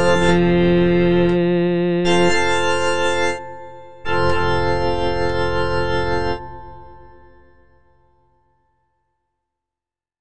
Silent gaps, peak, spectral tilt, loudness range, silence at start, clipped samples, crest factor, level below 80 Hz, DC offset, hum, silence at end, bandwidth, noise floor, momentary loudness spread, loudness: none; -4 dBFS; -6 dB/octave; 10 LU; 0 s; under 0.1%; 14 dB; -36 dBFS; under 0.1%; none; 0 s; 10 kHz; -89 dBFS; 14 LU; -18 LUFS